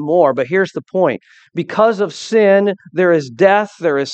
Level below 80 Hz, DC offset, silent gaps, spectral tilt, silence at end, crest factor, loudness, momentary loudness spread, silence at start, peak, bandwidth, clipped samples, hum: -66 dBFS; under 0.1%; none; -6 dB/octave; 0 s; 14 dB; -15 LUFS; 8 LU; 0 s; 0 dBFS; 8.6 kHz; under 0.1%; none